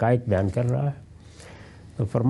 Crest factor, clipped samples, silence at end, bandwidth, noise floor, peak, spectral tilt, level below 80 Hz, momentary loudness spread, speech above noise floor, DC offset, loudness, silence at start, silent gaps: 16 dB; under 0.1%; 0 s; 11.5 kHz; -45 dBFS; -8 dBFS; -9 dB/octave; -52 dBFS; 23 LU; 22 dB; under 0.1%; -25 LUFS; 0 s; none